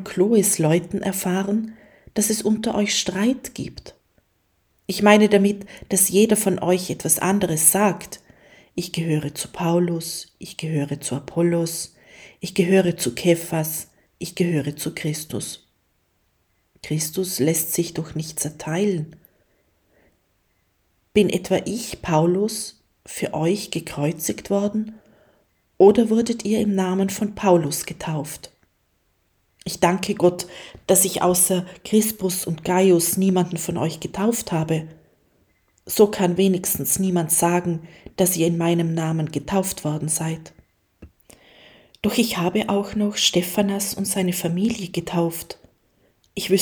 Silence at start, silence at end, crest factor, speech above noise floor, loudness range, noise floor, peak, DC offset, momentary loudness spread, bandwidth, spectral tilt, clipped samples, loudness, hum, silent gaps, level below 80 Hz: 0 s; 0 s; 22 dB; 46 dB; 7 LU; -67 dBFS; 0 dBFS; under 0.1%; 15 LU; over 20 kHz; -4.5 dB/octave; under 0.1%; -21 LUFS; none; none; -54 dBFS